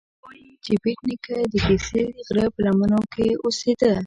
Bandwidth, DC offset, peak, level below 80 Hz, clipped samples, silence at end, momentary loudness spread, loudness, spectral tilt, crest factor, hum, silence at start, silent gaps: 9.6 kHz; under 0.1%; -6 dBFS; -42 dBFS; under 0.1%; 0 s; 6 LU; -22 LUFS; -6 dB/octave; 16 dB; none; 0.25 s; none